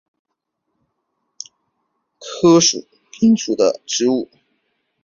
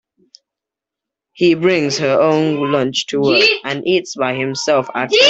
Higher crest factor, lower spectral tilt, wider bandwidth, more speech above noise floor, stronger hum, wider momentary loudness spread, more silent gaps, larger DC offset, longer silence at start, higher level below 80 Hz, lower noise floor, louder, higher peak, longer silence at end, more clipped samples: about the same, 18 dB vs 14 dB; about the same, -4 dB/octave vs -4 dB/octave; second, 7.4 kHz vs 8.2 kHz; second, 60 dB vs 70 dB; neither; first, 24 LU vs 7 LU; neither; neither; first, 2.2 s vs 1.35 s; about the same, -60 dBFS vs -60 dBFS; second, -75 dBFS vs -85 dBFS; about the same, -16 LUFS vs -15 LUFS; about the same, -2 dBFS vs 0 dBFS; first, 0.8 s vs 0 s; neither